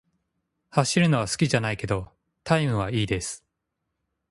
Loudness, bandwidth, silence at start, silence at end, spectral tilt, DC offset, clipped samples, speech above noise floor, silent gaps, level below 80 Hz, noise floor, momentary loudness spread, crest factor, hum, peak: -25 LUFS; 11.5 kHz; 0.75 s; 0.95 s; -5 dB/octave; under 0.1%; under 0.1%; 57 dB; none; -50 dBFS; -81 dBFS; 14 LU; 22 dB; none; -4 dBFS